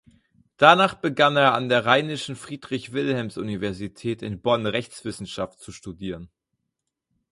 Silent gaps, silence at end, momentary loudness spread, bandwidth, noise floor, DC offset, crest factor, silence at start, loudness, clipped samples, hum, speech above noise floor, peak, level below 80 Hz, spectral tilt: none; 1.05 s; 17 LU; 11.5 kHz; -81 dBFS; under 0.1%; 24 dB; 0.6 s; -22 LUFS; under 0.1%; none; 58 dB; 0 dBFS; -56 dBFS; -5 dB/octave